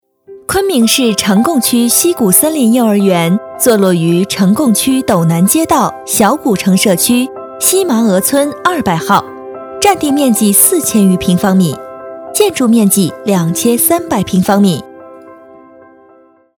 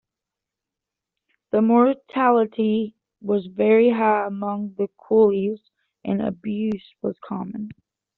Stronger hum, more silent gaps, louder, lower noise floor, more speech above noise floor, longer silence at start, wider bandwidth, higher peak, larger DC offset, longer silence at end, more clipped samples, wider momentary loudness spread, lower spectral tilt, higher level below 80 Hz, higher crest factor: neither; neither; first, -10 LUFS vs -21 LUFS; second, -45 dBFS vs -86 dBFS; second, 35 dB vs 66 dB; second, 0.3 s vs 1.55 s; first, over 20 kHz vs 4.2 kHz; first, 0 dBFS vs -4 dBFS; neither; first, 1.25 s vs 0.45 s; first, 0.3% vs under 0.1%; second, 6 LU vs 15 LU; second, -4.5 dB/octave vs -6 dB/octave; first, -46 dBFS vs -66 dBFS; second, 12 dB vs 18 dB